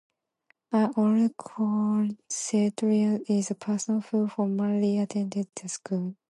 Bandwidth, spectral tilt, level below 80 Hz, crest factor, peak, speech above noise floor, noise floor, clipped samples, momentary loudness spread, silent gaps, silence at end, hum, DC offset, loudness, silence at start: 11.5 kHz; -6 dB/octave; -76 dBFS; 14 dB; -12 dBFS; 43 dB; -69 dBFS; under 0.1%; 8 LU; none; 0.2 s; none; under 0.1%; -27 LUFS; 0.7 s